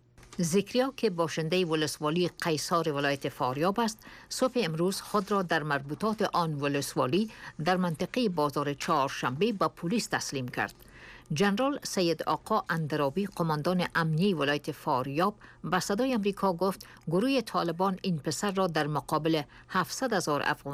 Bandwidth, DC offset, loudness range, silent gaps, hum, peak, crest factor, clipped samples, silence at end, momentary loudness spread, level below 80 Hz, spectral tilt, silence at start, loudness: 15.5 kHz; under 0.1%; 1 LU; none; none; -16 dBFS; 14 dB; under 0.1%; 0 s; 5 LU; -62 dBFS; -5 dB/octave; 0.2 s; -29 LUFS